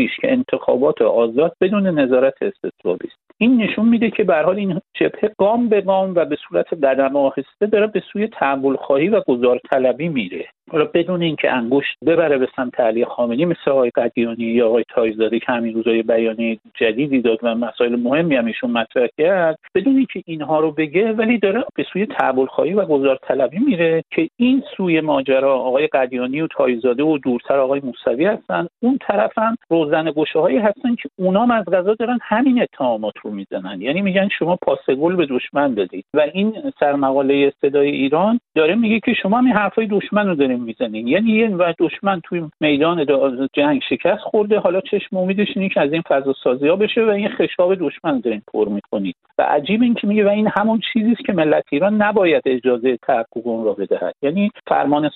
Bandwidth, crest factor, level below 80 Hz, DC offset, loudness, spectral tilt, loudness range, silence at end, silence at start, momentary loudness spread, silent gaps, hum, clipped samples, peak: 4.2 kHz; 16 dB; -60 dBFS; under 0.1%; -18 LUFS; -4.5 dB/octave; 2 LU; 0 s; 0 s; 6 LU; none; none; under 0.1%; 0 dBFS